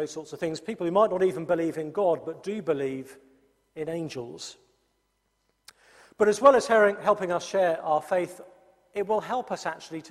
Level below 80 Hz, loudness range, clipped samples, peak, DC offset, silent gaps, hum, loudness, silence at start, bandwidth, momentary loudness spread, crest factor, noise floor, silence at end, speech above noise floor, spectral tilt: -70 dBFS; 11 LU; under 0.1%; -4 dBFS; under 0.1%; none; none; -26 LUFS; 0 s; 14 kHz; 17 LU; 22 dB; -74 dBFS; 0 s; 48 dB; -5 dB/octave